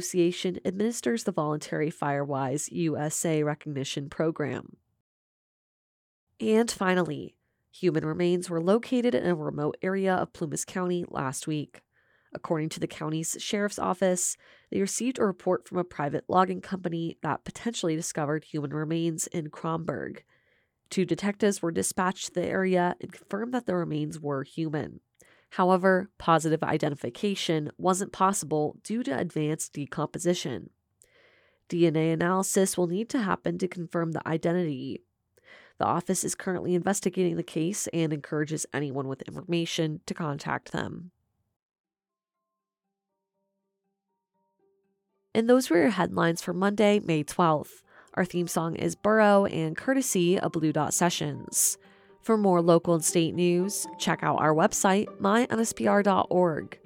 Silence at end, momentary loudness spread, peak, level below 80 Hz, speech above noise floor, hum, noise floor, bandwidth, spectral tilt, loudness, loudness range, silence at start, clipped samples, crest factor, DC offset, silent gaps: 0.1 s; 10 LU; -6 dBFS; -66 dBFS; over 63 dB; none; under -90 dBFS; 17 kHz; -5 dB/octave; -27 LUFS; 7 LU; 0 s; under 0.1%; 22 dB; under 0.1%; 5.00-6.27 s, 41.56-41.69 s, 41.80-41.84 s